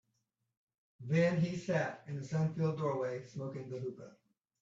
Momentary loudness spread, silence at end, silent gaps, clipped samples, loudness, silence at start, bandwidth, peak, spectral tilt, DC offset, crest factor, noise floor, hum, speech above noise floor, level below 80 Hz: 13 LU; 0.5 s; none; under 0.1%; -36 LUFS; 1 s; 7.8 kHz; -20 dBFS; -7.5 dB/octave; under 0.1%; 18 dB; -83 dBFS; none; 48 dB; -74 dBFS